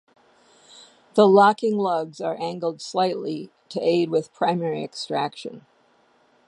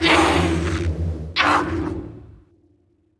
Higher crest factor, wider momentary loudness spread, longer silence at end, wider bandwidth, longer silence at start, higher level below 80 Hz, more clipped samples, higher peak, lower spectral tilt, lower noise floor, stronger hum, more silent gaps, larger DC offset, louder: about the same, 22 dB vs 18 dB; about the same, 15 LU vs 13 LU; about the same, 0.9 s vs 0.85 s; about the same, 11 kHz vs 11 kHz; first, 1.15 s vs 0 s; second, -78 dBFS vs -34 dBFS; neither; about the same, -2 dBFS vs -2 dBFS; about the same, -6 dB/octave vs -5 dB/octave; about the same, -61 dBFS vs -61 dBFS; neither; neither; neither; about the same, -22 LUFS vs -20 LUFS